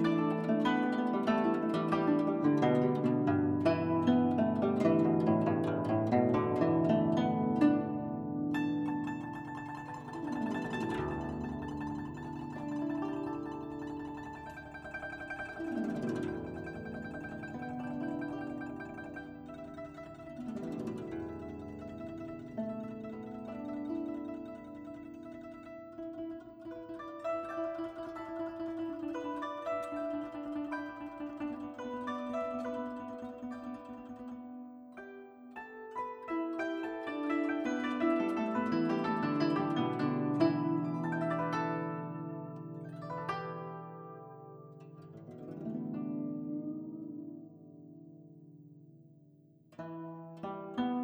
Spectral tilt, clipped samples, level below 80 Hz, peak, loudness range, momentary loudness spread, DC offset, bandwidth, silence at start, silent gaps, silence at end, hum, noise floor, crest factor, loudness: -8 dB/octave; under 0.1%; -64 dBFS; -16 dBFS; 13 LU; 18 LU; under 0.1%; 9.4 kHz; 0 s; none; 0 s; none; -62 dBFS; 20 dB; -35 LUFS